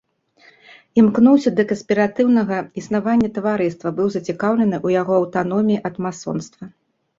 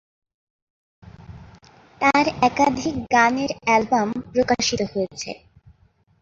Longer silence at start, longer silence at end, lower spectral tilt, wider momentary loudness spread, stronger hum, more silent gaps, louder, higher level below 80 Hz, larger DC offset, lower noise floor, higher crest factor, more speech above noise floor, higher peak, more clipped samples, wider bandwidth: about the same, 0.95 s vs 1.05 s; second, 0.5 s vs 0.85 s; first, -7 dB/octave vs -4 dB/octave; about the same, 12 LU vs 10 LU; neither; neither; about the same, -18 LUFS vs -20 LUFS; second, -58 dBFS vs -52 dBFS; neither; second, -53 dBFS vs -59 dBFS; about the same, 16 dB vs 20 dB; about the same, 36 dB vs 39 dB; about the same, -2 dBFS vs -2 dBFS; neither; about the same, 7.6 kHz vs 8 kHz